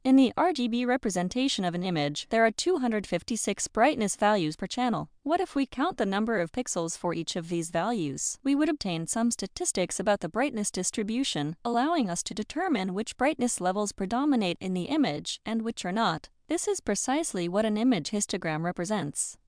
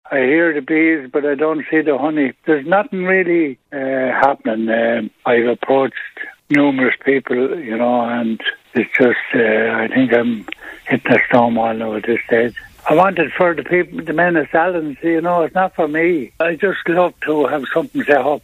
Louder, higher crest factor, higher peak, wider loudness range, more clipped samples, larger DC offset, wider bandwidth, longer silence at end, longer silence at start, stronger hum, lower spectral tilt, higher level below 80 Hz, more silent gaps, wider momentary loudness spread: second, -28 LUFS vs -16 LUFS; about the same, 18 dB vs 16 dB; second, -10 dBFS vs 0 dBFS; about the same, 2 LU vs 1 LU; neither; neither; second, 10.5 kHz vs 14.5 kHz; about the same, 0.15 s vs 0.05 s; about the same, 0.05 s vs 0.05 s; neither; second, -4 dB/octave vs -7.5 dB/octave; about the same, -58 dBFS vs -56 dBFS; neither; about the same, 6 LU vs 7 LU